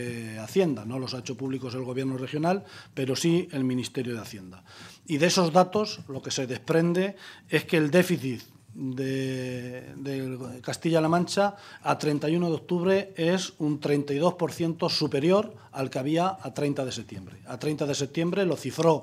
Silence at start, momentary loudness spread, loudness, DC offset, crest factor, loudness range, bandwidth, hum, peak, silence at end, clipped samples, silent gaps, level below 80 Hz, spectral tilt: 0 s; 13 LU; -27 LUFS; under 0.1%; 22 dB; 4 LU; 15 kHz; none; -6 dBFS; 0 s; under 0.1%; none; -70 dBFS; -5.5 dB/octave